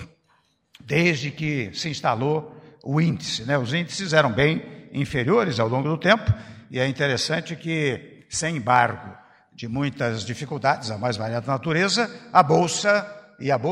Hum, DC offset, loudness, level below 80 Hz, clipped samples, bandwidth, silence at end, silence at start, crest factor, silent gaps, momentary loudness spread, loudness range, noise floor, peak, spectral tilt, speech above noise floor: none; under 0.1%; -23 LUFS; -54 dBFS; under 0.1%; 12 kHz; 0 s; 0 s; 20 dB; none; 11 LU; 3 LU; -65 dBFS; -2 dBFS; -5 dB/octave; 42 dB